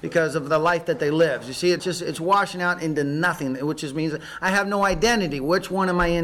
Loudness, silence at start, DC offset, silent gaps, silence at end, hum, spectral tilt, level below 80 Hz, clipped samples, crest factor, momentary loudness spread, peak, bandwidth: -22 LUFS; 0.05 s; under 0.1%; none; 0 s; none; -5 dB/octave; -44 dBFS; under 0.1%; 12 dB; 6 LU; -10 dBFS; 17 kHz